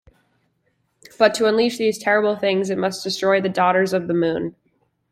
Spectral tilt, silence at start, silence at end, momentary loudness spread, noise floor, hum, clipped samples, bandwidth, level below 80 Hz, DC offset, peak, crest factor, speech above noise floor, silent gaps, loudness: -4.5 dB/octave; 1.2 s; 0.6 s; 6 LU; -68 dBFS; none; under 0.1%; 15.5 kHz; -62 dBFS; under 0.1%; -2 dBFS; 18 dB; 49 dB; none; -19 LUFS